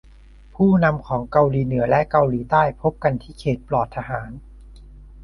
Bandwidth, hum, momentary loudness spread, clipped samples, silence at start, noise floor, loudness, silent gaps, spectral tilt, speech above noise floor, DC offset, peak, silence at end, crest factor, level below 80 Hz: 11 kHz; none; 11 LU; under 0.1%; 0.6 s; -46 dBFS; -20 LUFS; none; -9.5 dB/octave; 26 dB; under 0.1%; -2 dBFS; 0 s; 18 dB; -42 dBFS